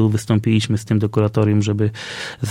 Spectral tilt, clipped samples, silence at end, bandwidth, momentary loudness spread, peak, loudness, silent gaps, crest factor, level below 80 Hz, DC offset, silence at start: -6.5 dB/octave; under 0.1%; 0 s; 12 kHz; 9 LU; -4 dBFS; -19 LUFS; none; 14 dB; -50 dBFS; under 0.1%; 0 s